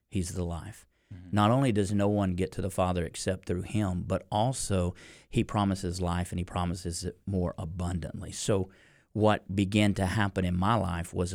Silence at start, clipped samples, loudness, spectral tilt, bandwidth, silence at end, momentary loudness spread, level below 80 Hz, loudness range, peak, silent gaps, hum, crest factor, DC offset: 0.1 s; under 0.1%; -30 LUFS; -6 dB/octave; 16 kHz; 0 s; 9 LU; -48 dBFS; 3 LU; -10 dBFS; none; none; 20 dB; under 0.1%